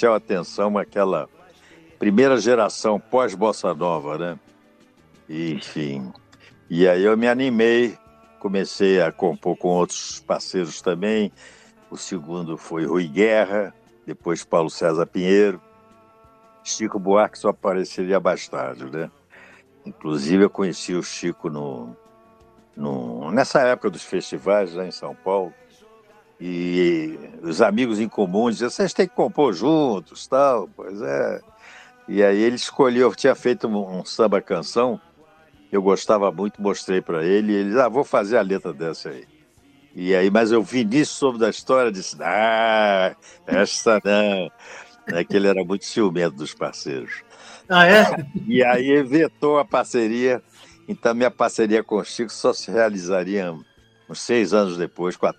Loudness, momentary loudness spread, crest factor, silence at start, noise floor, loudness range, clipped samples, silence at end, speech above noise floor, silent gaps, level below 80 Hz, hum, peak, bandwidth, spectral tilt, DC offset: -21 LUFS; 13 LU; 22 dB; 0 s; -54 dBFS; 6 LU; under 0.1%; 0.05 s; 34 dB; none; -64 dBFS; none; 0 dBFS; 14.5 kHz; -5 dB/octave; under 0.1%